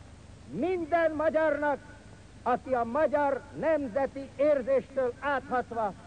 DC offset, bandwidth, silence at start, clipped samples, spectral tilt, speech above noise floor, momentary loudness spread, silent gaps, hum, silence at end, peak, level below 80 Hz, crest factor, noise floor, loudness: under 0.1%; 9.6 kHz; 0 s; under 0.1%; -6.5 dB/octave; 21 dB; 7 LU; none; none; 0 s; -16 dBFS; -56 dBFS; 14 dB; -50 dBFS; -29 LUFS